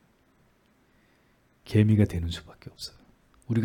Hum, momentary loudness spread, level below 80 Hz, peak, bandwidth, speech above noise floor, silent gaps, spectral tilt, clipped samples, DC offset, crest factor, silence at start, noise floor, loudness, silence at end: none; 19 LU; -52 dBFS; -8 dBFS; 12 kHz; 39 dB; none; -7.5 dB/octave; under 0.1%; under 0.1%; 20 dB; 1.65 s; -64 dBFS; -26 LUFS; 0 s